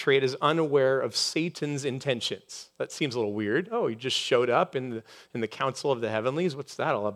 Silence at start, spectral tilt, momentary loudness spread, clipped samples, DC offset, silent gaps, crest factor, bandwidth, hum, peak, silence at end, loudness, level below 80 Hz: 0 s; -4.5 dB/octave; 11 LU; under 0.1%; under 0.1%; none; 20 dB; 14 kHz; none; -8 dBFS; 0 s; -28 LUFS; -80 dBFS